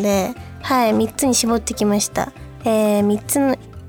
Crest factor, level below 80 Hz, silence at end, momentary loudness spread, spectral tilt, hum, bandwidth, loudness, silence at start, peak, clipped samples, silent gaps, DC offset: 14 dB; -44 dBFS; 0 s; 9 LU; -4 dB/octave; none; 18.5 kHz; -19 LUFS; 0 s; -4 dBFS; under 0.1%; none; under 0.1%